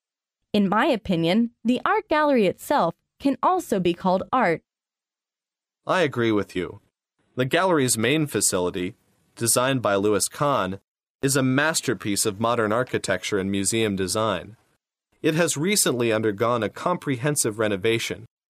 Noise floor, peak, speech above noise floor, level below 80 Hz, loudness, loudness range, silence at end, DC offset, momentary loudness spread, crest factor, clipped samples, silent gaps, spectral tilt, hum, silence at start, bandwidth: under -90 dBFS; -6 dBFS; over 67 dB; -58 dBFS; -23 LUFS; 3 LU; 0.25 s; under 0.1%; 7 LU; 18 dB; under 0.1%; 10.88-10.95 s, 11.10-11.19 s; -4 dB/octave; none; 0.55 s; 15.5 kHz